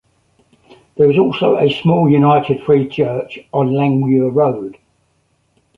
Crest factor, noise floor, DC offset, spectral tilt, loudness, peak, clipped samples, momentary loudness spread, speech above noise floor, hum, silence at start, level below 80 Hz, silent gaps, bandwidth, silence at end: 14 dB; -61 dBFS; under 0.1%; -9.5 dB/octave; -14 LUFS; 0 dBFS; under 0.1%; 10 LU; 48 dB; none; 0.95 s; -54 dBFS; none; 5.6 kHz; 1.05 s